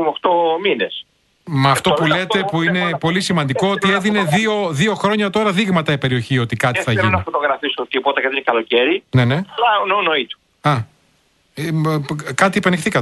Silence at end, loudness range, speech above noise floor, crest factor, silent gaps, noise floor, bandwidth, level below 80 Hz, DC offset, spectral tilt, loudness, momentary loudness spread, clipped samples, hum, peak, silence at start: 0 s; 2 LU; 42 dB; 16 dB; none; -59 dBFS; 12 kHz; -52 dBFS; under 0.1%; -5.5 dB/octave; -17 LUFS; 6 LU; under 0.1%; none; 0 dBFS; 0 s